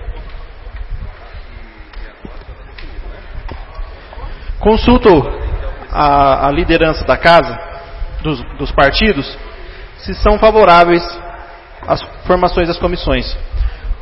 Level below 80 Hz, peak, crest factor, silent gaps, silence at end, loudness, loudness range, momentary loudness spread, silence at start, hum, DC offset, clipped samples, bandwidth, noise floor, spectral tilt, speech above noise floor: -22 dBFS; 0 dBFS; 14 dB; none; 0 s; -12 LUFS; 20 LU; 25 LU; 0 s; none; under 0.1%; 0.1%; 7 kHz; -32 dBFS; -7.5 dB/octave; 21 dB